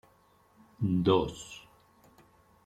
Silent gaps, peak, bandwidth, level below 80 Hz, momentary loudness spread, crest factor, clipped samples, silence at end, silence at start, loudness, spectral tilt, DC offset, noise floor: none; -12 dBFS; 14 kHz; -58 dBFS; 20 LU; 22 dB; under 0.1%; 1.1 s; 0.8 s; -29 LUFS; -7 dB/octave; under 0.1%; -64 dBFS